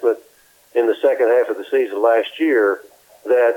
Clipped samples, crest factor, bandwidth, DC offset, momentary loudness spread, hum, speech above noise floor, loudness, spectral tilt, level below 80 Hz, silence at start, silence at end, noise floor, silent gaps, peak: under 0.1%; 14 dB; 17.5 kHz; under 0.1%; 9 LU; none; 36 dB; -18 LUFS; -3.5 dB/octave; -74 dBFS; 0 s; 0 s; -52 dBFS; none; -2 dBFS